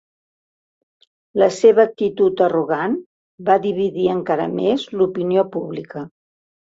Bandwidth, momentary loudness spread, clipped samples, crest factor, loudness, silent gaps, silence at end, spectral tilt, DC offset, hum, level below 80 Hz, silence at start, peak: 8 kHz; 14 LU; under 0.1%; 18 dB; -18 LUFS; 3.06-3.38 s; 0.6 s; -6.5 dB/octave; under 0.1%; none; -62 dBFS; 1.35 s; -2 dBFS